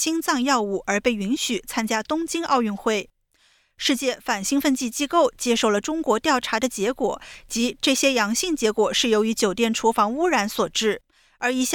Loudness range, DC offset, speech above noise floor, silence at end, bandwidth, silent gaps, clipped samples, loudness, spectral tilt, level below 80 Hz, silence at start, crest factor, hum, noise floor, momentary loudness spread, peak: 4 LU; under 0.1%; 40 dB; 0 s; 18.5 kHz; none; under 0.1%; -22 LUFS; -2.5 dB/octave; -54 dBFS; 0 s; 16 dB; none; -62 dBFS; 6 LU; -6 dBFS